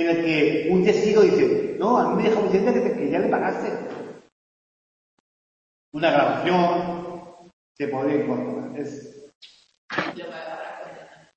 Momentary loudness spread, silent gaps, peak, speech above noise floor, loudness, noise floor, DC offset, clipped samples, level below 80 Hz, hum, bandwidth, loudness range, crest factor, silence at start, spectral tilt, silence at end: 17 LU; 4.32-5.92 s, 7.53-7.75 s, 9.35-9.41 s, 9.78-9.89 s; -6 dBFS; 23 dB; -22 LUFS; -44 dBFS; under 0.1%; under 0.1%; -62 dBFS; none; 8 kHz; 9 LU; 18 dB; 0 s; -6.5 dB/octave; 0.3 s